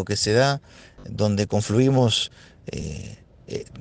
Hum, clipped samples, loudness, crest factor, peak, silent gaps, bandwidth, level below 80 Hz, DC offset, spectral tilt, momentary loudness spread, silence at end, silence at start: none; under 0.1%; -22 LUFS; 18 dB; -6 dBFS; none; 9.8 kHz; -50 dBFS; under 0.1%; -5 dB/octave; 18 LU; 0 s; 0 s